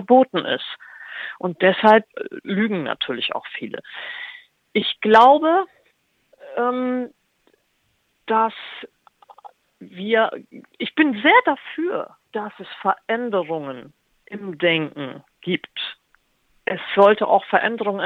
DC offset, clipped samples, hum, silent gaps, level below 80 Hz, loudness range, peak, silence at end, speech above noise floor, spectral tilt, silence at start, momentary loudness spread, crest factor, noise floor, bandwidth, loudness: under 0.1%; under 0.1%; none; none; -70 dBFS; 7 LU; -2 dBFS; 0 s; 47 dB; -6.5 dB/octave; 0 s; 19 LU; 20 dB; -67 dBFS; 8.2 kHz; -20 LUFS